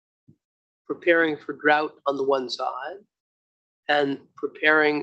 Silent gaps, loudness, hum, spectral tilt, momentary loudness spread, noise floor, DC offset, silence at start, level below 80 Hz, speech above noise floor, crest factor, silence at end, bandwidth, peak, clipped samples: 3.20-3.83 s; -23 LUFS; none; -4.5 dB/octave; 15 LU; under -90 dBFS; under 0.1%; 0.9 s; -80 dBFS; over 67 dB; 22 dB; 0 s; 8.2 kHz; -4 dBFS; under 0.1%